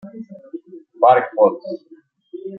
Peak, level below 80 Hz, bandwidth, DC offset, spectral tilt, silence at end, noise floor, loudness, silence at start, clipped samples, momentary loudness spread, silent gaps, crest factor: -2 dBFS; -72 dBFS; 4.9 kHz; under 0.1%; -9 dB/octave; 0 s; -39 dBFS; -15 LUFS; 0.05 s; under 0.1%; 22 LU; none; 18 dB